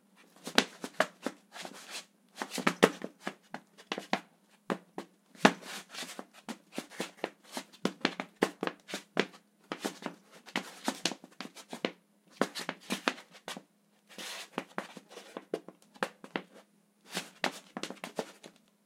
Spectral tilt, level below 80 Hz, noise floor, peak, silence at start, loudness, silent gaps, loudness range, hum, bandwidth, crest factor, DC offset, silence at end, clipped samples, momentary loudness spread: -3.5 dB/octave; -86 dBFS; -67 dBFS; 0 dBFS; 0.45 s; -36 LUFS; none; 8 LU; none; 16 kHz; 38 dB; under 0.1%; 0.35 s; under 0.1%; 18 LU